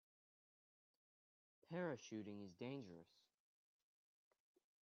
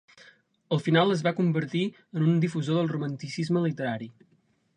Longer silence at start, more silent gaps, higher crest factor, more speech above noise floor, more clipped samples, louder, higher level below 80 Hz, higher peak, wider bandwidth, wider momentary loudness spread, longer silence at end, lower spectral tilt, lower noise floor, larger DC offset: first, 1.7 s vs 0.7 s; neither; about the same, 22 dB vs 20 dB; first, over 39 dB vs 31 dB; neither; second, -52 LUFS vs -27 LUFS; second, under -90 dBFS vs -72 dBFS; second, -34 dBFS vs -6 dBFS; second, 7 kHz vs 9.6 kHz; about the same, 10 LU vs 10 LU; first, 1.75 s vs 0.65 s; about the same, -6 dB/octave vs -7 dB/octave; first, under -90 dBFS vs -57 dBFS; neither